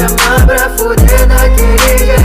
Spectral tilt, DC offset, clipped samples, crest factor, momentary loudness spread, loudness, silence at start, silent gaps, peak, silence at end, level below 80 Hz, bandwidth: -4.5 dB/octave; under 0.1%; under 0.1%; 6 dB; 2 LU; -8 LUFS; 0 s; none; 0 dBFS; 0 s; -8 dBFS; 16 kHz